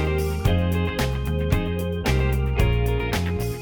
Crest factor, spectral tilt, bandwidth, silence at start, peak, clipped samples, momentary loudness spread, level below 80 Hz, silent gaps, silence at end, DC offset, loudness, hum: 16 dB; -6.5 dB/octave; 20 kHz; 0 s; -6 dBFS; under 0.1%; 3 LU; -26 dBFS; none; 0 s; under 0.1%; -23 LUFS; none